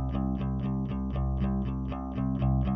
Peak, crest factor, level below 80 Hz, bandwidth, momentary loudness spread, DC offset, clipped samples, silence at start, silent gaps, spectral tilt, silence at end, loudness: -16 dBFS; 12 dB; -34 dBFS; 3.9 kHz; 5 LU; under 0.1%; under 0.1%; 0 s; none; -9.5 dB/octave; 0 s; -31 LUFS